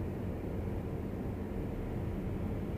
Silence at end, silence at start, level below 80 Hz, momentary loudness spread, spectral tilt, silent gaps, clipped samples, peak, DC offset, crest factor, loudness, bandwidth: 0 s; 0 s; -44 dBFS; 1 LU; -9 dB/octave; none; under 0.1%; -26 dBFS; under 0.1%; 10 dB; -39 LUFS; 15 kHz